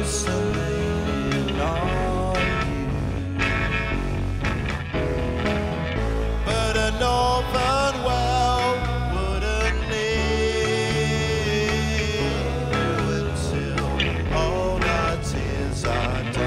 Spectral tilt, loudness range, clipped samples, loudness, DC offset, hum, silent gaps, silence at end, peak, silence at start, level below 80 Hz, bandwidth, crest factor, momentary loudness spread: -5 dB/octave; 3 LU; under 0.1%; -23 LUFS; under 0.1%; none; none; 0 s; -8 dBFS; 0 s; -30 dBFS; 15 kHz; 16 dB; 5 LU